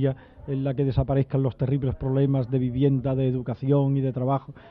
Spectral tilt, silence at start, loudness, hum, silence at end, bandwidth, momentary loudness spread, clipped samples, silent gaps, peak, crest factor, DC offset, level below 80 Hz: -12.5 dB/octave; 0 s; -25 LUFS; none; 0 s; 4.4 kHz; 5 LU; under 0.1%; none; -10 dBFS; 14 dB; under 0.1%; -44 dBFS